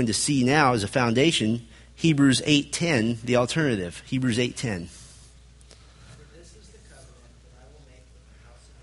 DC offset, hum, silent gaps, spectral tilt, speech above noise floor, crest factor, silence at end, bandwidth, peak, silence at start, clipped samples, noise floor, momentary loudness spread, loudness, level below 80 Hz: under 0.1%; none; none; -4.5 dB/octave; 28 dB; 22 dB; 2.45 s; 11.5 kHz; -4 dBFS; 0 s; under 0.1%; -51 dBFS; 11 LU; -23 LUFS; -52 dBFS